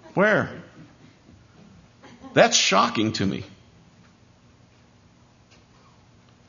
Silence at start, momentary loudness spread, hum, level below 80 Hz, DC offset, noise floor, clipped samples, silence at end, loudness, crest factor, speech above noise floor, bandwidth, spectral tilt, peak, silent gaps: 0.15 s; 18 LU; 60 Hz at -50 dBFS; -62 dBFS; under 0.1%; -55 dBFS; under 0.1%; 3 s; -21 LUFS; 24 dB; 35 dB; 7.4 kHz; -3 dB/octave; -4 dBFS; none